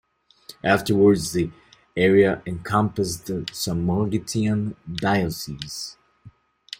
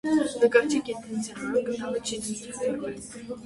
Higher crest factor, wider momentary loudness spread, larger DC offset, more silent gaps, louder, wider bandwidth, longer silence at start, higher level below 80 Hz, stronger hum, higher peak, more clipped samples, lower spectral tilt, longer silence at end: about the same, 20 dB vs 22 dB; about the same, 14 LU vs 12 LU; neither; neither; first, -23 LUFS vs -27 LUFS; first, 16.5 kHz vs 11.5 kHz; first, 0.5 s vs 0.05 s; first, -52 dBFS vs -62 dBFS; neither; about the same, -4 dBFS vs -6 dBFS; neither; first, -5.5 dB/octave vs -4 dB/octave; first, 0.5 s vs 0 s